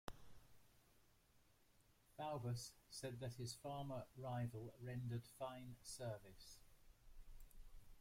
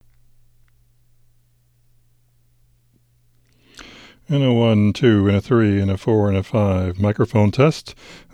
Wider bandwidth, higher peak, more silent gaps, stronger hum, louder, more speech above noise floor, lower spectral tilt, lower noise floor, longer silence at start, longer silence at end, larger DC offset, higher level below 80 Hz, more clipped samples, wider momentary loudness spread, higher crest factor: first, 16.5 kHz vs 9.6 kHz; second, -30 dBFS vs -2 dBFS; neither; second, none vs 60 Hz at -45 dBFS; second, -51 LUFS vs -17 LUFS; second, 24 dB vs 42 dB; second, -5.5 dB/octave vs -8 dB/octave; first, -75 dBFS vs -59 dBFS; second, 0.05 s vs 3.8 s; second, 0 s vs 0.15 s; neither; second, -68 dBFS vs -50 dBFS; neither; first, 20 LU vs 6 LU; first, 24 dB vs 18 dB